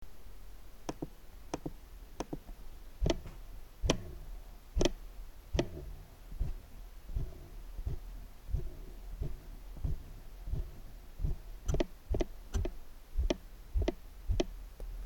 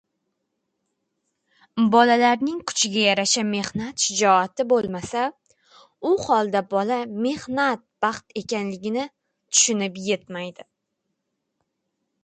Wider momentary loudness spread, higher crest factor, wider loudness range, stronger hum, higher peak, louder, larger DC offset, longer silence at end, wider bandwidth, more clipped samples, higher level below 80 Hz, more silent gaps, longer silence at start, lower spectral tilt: first, 18 LU vs 11 LU; about the same, 24 dB vs 22 dB; about the same, 7 LU vs 5 LU; neither; second, -14 dBFS vs -2 dBFS; second, -41 LUFS vs -22 LUFS; neither; second, 0 s vs 1.6 s; first, 17.5 kHz vs 9.6 kHz; neither; first, -40 dBFS vs -64 dBFS; neither; second, 0 s vs 1.75 s; first, -5.5 dB/octave vs -2.5 dB/octave